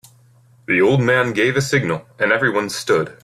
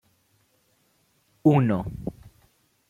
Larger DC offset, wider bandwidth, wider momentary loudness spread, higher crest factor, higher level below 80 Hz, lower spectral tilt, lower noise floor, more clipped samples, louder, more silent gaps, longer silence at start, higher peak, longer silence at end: neither; first, 14.5 kHz vs 9.6 kHz; second, 6 LU vs 17 LU; second, 16 dB vs 22 dB; about the same, -54 dBFS vs -52 dBFS; second, -5 dB/octave vs -9.5 dB/octave; second, -51 dBFS vs -67 dBFS; neither; first, -17 LUFS vs -24 LUFS; neither; second, 0.7 s vs 1.45 s; first, -2 dBFS vs -6 dBFS; second, 0.1 s vs 0.6 s